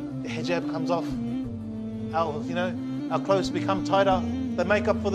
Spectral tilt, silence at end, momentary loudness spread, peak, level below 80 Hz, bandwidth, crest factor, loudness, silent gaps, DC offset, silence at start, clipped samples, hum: -6.5 dB/octave; 0 s; 9 LU; -8 dBFS; -50 dBFS; 10.5 kHz; 18 dB; -27 LUFS; none; under 0.1%; 0 s; under 0.1%; none